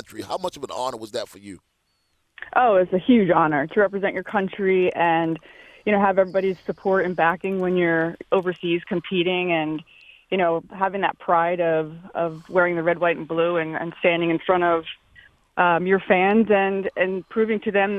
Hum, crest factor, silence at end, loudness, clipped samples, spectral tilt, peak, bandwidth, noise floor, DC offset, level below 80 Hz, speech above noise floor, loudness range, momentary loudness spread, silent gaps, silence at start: none; 20 dB; 0 s; -22 LUFS; under 0.1%; -6.5 dB/octave; -2 dBFS; 13 kHz; -69 dBFS; under 0.1%; -60 dBFS; 48 dB; 3 LU; 11 LU; none; 0.1 s